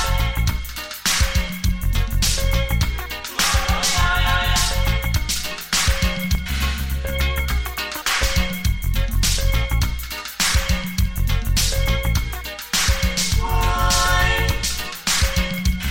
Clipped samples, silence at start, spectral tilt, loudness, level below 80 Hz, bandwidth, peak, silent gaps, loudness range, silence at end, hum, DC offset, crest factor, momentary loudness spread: under 0.1%; 0 s; -3 dB/octave; -21 LUFS; -22 dBFS; 17 kHz; -6 dBFS; none; 2 LU; 0 s; none; under 0.1%; 14 dB; 6 LU